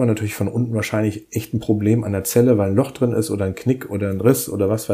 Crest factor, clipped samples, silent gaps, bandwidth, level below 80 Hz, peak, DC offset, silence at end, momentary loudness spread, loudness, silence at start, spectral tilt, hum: 18 dB; under 0.1%; none; 15.5 kHz; -52 dBFS; -2 dBFS; under 0.1%; 0 s; 7 LU; -20 LUFS; 0 s; -6.5 dB/octave; none